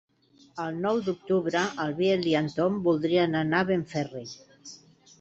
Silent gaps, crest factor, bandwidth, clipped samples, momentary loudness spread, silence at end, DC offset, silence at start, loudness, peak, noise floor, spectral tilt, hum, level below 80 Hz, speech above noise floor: none; 18 dB; 8 kHz; under 0.1%; 20 LU; 0.45 s; under 0.1%; 0.55 s; -27 LUFS; -10 dBFS; -59 dBFS; -6 dB/octave; none; -66 dBFS; 33 dB